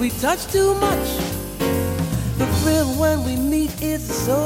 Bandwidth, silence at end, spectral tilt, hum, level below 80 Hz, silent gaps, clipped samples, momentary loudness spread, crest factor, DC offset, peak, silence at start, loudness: 16.5 kHz; 0 s; -5 dB/octave; none; -34 dBFS; none; under 0.1%; 5 LU; 16 dB; under 0.1%; -4 dBFS; 0 s; -21 LUFS